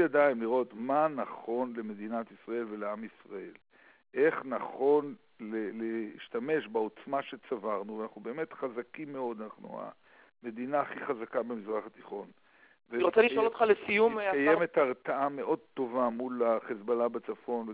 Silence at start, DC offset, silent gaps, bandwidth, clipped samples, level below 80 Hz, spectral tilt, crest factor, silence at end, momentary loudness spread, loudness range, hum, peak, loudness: 0 s; under 0.1%; none; 4 kHz; under 0.1%; -78 dBFS; -3.5 dB/octave; 20 dB; 0 s; 17 LU; 10 LU; none; -12 dBFS; -32 LUFS